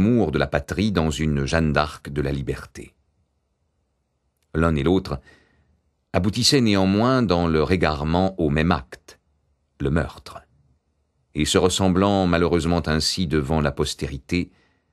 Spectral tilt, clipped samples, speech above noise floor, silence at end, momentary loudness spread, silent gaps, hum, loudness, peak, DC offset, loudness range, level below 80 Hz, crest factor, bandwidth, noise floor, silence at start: -5.5 dB/octave; under 0.1%; 50 dB; 0.45 s; 12 LU; none; none; -21 LUFS; -2 dBFS; under 0.1%; 7 LU; -38 dBFS; 20 dB; 13 kHz; -71 dBFS; 0 s